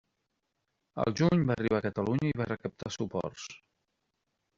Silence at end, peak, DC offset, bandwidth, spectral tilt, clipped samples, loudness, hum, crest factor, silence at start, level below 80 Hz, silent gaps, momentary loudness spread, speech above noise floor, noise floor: 1 s; -14 dBFS; under 0.1%; 7.6 kHz; -6.5 dB/octave; under 0.1%; -31 LUFS; none; 20 dB; 0.95 s; -60 dBFS; none; 14 LU; 51 dB; -82 dBFS